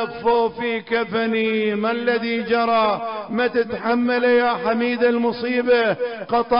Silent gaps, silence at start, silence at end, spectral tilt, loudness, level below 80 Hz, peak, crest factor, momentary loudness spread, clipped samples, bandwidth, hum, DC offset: none; 0 s; 0 s; -9.5 dB/octave; -20 LUFS; -58 dBFS; -8 dBFS; 10 dB; 5 LU; under 0.1%; 5.4 kHz; none; 0.1%